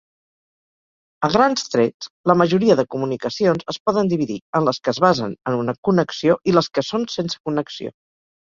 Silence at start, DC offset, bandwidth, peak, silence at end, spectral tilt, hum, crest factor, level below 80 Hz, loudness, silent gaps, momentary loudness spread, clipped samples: 1.2 s; under 0.1%; 7.6 kHz; -2 dBFS; 0.6 s; -6 dB/octave; none; 18 dB; -56 dBFS; -20 LUFS; 1.94-2.00 s, 2.10-2.24 s, 3.80-3.86 s, 4.41-4.53 s, 5.78-5.83 s, 7.40-7.44 s; 8 LU; under 0.1%